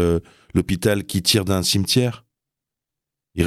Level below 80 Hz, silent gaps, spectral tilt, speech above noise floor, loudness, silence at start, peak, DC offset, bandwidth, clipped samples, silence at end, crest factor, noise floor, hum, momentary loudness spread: -44 dBFS; none; -4.5 dB/octave; 65 dB; -20 LUFS; 0 s; -2 dBFS; under 0.1%; 16 kHz; under 0.1%; 0 s; 18 dB; -85 dBFS; none; 8 LU